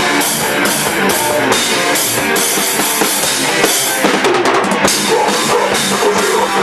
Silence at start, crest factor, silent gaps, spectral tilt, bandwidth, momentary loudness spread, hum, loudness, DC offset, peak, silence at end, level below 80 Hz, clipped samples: 0 s; 12 dB; none; -2 dB/octave; 15.5 kHz; 1 LU; none; -12 LUFS; 0.2%; 0 dBFS; 0 s; -50 dBFS; under 0.1%